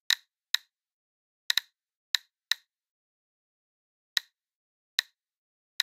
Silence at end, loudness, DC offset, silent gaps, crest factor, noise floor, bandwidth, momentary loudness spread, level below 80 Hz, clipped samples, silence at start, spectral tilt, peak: 0 s; -31 LUFS; under 0.1%; 0.50-0.54 s, 0.93-1.50 s, 1.95-2.14 s, 2.89-4.16 s, 4.55-4.98 s, 5.37-5.79 s; 30 dB; under -90 dBFS; 16 kHz; 3 LU; under -90 dBFS; under 0.1%; 0.1 s; 8 dB/octave; -6 dBFS